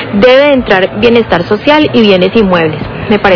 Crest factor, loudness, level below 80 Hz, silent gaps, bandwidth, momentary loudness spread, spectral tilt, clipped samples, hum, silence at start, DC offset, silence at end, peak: 8 dB; -7 LUFS; -32 dBFS; none; 5.4 kHz; 6 LU; -7 dB/octave; 6%; none; 0 s; under 0.1%; 0 s; 0 dBFS